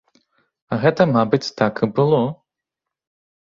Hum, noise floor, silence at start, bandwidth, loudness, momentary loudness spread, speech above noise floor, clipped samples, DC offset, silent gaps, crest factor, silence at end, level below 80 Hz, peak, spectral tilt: none; -84 dBFS; 0.7 s; 7.6 kHz; -19 LUFS; 6 LU; 67 dB; under 0.1%; under 0.1%; none; 20 dB; 1.05 s; -58 dBFS; 0 dBFS; -7 dB/octave